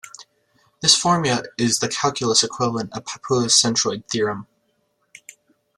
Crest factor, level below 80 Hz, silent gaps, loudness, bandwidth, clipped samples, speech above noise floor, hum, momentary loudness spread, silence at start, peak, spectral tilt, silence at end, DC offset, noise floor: 22 dB; -60 dBFS; none; -19 LUFS; 14.5 kHz; under 0.1%; 48 dB; none; 13 LU; 0.05 s; 0 dBFS; -2.5 dB/octave; 1.35 s; under 0.1%; -68 dBFS